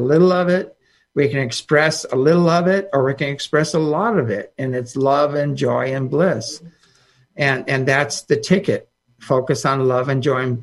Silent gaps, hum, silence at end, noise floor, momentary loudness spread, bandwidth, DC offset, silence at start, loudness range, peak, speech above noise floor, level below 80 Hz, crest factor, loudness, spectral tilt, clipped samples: none; none; 0 s; -56 dBFS; 9 LU; 12 kHz; under 0.1%; 0 s; 3 LU; -2 dBFS; 39 dB; -60 dBFS; 16 dB; -18 LUFS; -5.5 dB/octave; under 0.1%